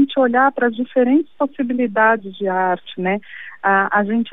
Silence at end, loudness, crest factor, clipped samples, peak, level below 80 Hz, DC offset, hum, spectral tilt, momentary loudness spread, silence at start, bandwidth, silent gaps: 0.05 s; -18 LUFS; 14 dB; under 0.1%; -4 dBFS; -72 dBFS; 0.6%; none; -9.5 dB/octave; 7 LU; 0 s; 3.9 kHz; none